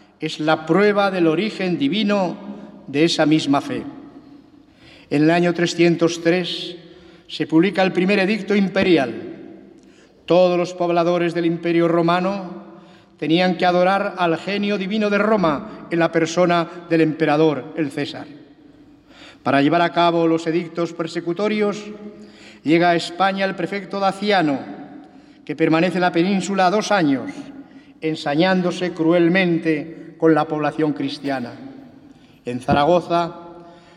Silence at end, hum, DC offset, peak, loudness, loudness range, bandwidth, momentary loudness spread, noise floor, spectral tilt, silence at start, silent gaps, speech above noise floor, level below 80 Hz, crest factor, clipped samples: 0.25 s; none; under 0.1%; -4 dBFS; -19 LUFS; 2 LU; 11 kHz; 16 LU; -49 dBFS; -6 dB/octave; 0.2 s; none; 30 dB; -58 dBFS; 16 dB; under 0.1%